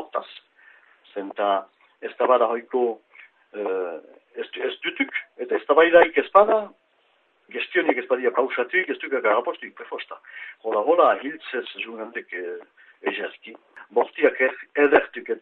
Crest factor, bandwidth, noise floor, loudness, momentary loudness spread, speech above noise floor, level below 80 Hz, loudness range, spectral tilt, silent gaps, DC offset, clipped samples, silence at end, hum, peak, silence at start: 24 dB; 4.3 kHz; -64 dBFS; -22 LUFS; 20 LU; 42 dB; -68 dBFS; 6 LU; -6.5 dB/octave; none; under 0.1%; under 0.1%; 0 s; none; 0 dBFS; 0 s